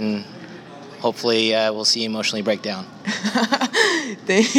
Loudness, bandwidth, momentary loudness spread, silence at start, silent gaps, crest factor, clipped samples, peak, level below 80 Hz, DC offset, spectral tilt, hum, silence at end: -20 LUFS; 16.5 kHz; 18 LU; 0 s; none; 20 dB; under 0.1%; 0 dBFS; -74 dBFS; under 0.1%; -3 dB/octave; none; 0 s